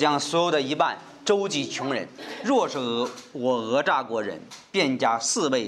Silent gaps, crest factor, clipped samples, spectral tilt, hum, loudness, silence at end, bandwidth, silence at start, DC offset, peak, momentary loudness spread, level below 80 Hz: none; 18 dB; under 0.1%; -3 dB/octave; none; -25 LUFS; 0 s; 13 kHz; 0 s; under 0.1%; -6 dBFS; 9 LU; -76 dBFS